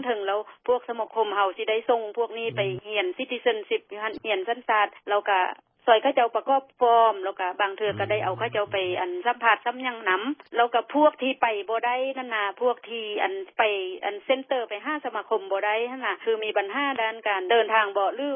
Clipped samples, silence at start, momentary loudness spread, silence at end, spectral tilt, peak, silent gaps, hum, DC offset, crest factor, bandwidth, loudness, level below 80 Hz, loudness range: under 0.1%; 0 s; 8 LU; 0 s; -8.5 dB/octave; -4 dBFS; none; none; under 0.1%; 22 dB; 4.9 kHz; -25 LUFS; -72 dBFS; 4 LU